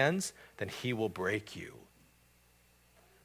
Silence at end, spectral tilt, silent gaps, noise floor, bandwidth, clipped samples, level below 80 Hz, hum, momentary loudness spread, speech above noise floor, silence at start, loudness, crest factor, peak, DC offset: 1.4 s; -4.5 dB/octave; none; -66 dBFS; 16 kHz; under 0.1%; -66 dBFS; 60 Hz at -65 dBFS; 15 LU; 31 dB; 0 s; -37 LUFS; 24 dB; -14 dBFS; under 0.1%